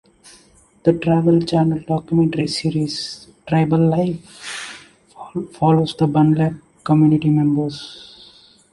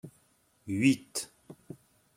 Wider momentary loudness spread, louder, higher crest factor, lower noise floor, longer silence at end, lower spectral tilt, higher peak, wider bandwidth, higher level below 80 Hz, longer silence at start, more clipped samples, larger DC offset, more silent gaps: second, 15 LU vs 24 LU; first, -18 LUFS vs -30 LUFS; second, 16 dB vs 22 dB; second, -52 dBFS vs -68 dBFS; first, 0.65 s vs 0.45 s; first, -7.5 dB/octave vs -4.5 dB/octave; first, -2 dBFS vs -12 dBFS; second, 11.5 kHz vs 16 kHz; first, -52 dBFS vs -72 dBFS; first, 0.85 s vs 0.05 s; neither; neither; neither